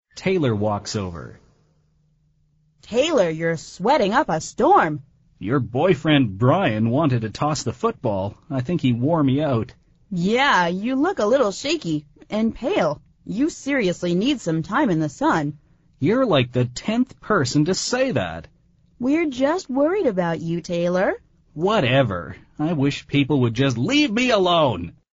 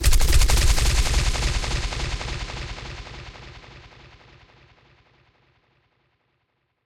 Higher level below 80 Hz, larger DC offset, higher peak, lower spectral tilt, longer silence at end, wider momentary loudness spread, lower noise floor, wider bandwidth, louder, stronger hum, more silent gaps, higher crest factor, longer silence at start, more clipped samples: second, -50 dBFS vs -24 dBFS; neither; about the same, -4 dBFS vs -6 dBFS; first, -5 dB/octave vs -3 dB/octave; second, 0.25 s vs 3.05 s; second, 10 LU vs 22 LU; second, -62 dBFS vs -72 dBFS; second, 8 kHz vs 16.5 kHz; first, -21 LUFS vs -24 LUFS; neither; neither; about the same, 18 dB vs 18 dB; first, 0.15 s vs 0 s; neither